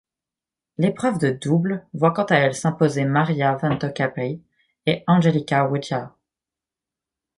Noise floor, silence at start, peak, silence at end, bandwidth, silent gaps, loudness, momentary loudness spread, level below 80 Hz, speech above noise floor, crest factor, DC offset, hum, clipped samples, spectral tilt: -89 dBFS; 0.8 s; -2 dBFS; 1.3 s; 11.5 kHz; none; -21 LUFS; 11 LU; -60 dBFS; 68 dB; 20 dB; under 0.1%; none; under 0.1%; -6.5 dB/octave